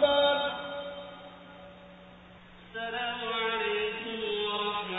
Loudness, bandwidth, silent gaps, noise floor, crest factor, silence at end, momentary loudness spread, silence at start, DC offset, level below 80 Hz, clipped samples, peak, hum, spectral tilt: -31 LUFS; 4 kHz; none; -52 dBFS; 20 dB; 0 s; 24 LU; 0 s; under 0.1%; -64 dBFS; under 0.1%; -12 dBFS; none; -6 dB/octave